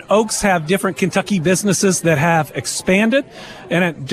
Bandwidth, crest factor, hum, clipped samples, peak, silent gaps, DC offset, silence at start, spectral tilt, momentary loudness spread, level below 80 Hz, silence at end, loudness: 14.5 kHz; 14 dB; none; under 0.1%; -2 dBFS; none; under 0.1%; 0 s; -4.5 dB/octave; 6 LU; -46 dBFS; 0 s; -16 LUFS